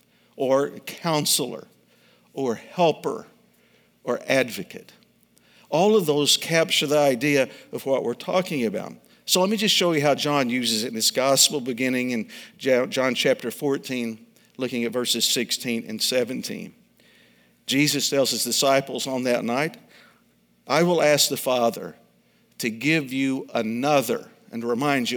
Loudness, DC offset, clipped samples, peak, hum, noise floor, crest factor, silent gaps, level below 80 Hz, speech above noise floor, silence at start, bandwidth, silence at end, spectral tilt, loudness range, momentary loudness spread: -22 LUFS; under 0.1%; under 0.1%; -2 dBFS; 60 Hz at -55 dBFS; -62 dBFS; 22 dB; none; -78 dBFS; 39 dB; 0.35 s; over 20 kHz; 0 s; -3 dB/octave; 5 LU; 13 LU